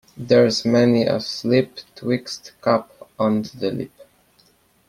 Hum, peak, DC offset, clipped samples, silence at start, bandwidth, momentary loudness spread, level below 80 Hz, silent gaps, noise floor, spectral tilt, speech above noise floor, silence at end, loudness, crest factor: none; -2 dBFS; under 0.1%; under 0.1%; 0.15 s; 14.5 kHz; 14 LU; -60 dBFS; none; -58 dBFS; -6 dB/octave; 39 dB; 0.85 s; -20 LUFS; 18 dB